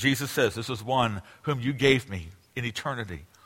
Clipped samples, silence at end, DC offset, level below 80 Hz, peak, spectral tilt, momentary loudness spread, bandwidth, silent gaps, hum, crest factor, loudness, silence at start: under 0.1%; 0.2 s; under 0.1%; -54 dBFS; -6 dBFS; -5 dB/octave; 15 LU; 16.5 kHz; none; none; 22 dB; -27 LUFS; 0 s